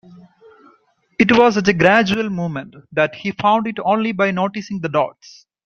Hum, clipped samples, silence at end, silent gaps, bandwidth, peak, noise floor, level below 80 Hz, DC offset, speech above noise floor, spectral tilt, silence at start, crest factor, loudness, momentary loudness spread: none; under 0.1%; 0.55 s; none; 7.4 kHz; 0 dBFS; -57 dBFS; -54 dBFS; under 0.1%; 40 dB; -6 dB/octave; 0.1 s; 18 dB; -17 LUFS; 12 LU